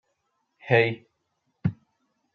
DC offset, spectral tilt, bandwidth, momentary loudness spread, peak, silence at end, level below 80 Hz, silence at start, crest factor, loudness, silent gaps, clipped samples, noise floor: under 0.1%; -8.5 dB/octave; 6.4 kHz; 19 LU; -6 dBFS; 0.6 s; -64 dBFS; 0.65 s; 24 dB; -25 LUFS; none; under 0.1%; -76 dBFS